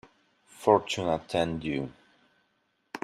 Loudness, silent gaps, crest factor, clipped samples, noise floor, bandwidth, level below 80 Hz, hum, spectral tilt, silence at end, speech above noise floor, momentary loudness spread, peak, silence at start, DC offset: -28 LUFS; none; 24 dB; under 0.1%; -74 dBFS; 13.5 kHz; -60 dBFS; none; -5.5 dB/octave; 0.05 s; 47 dB; 13 LU; -6 dBFS; 0.6 s; under 0.1%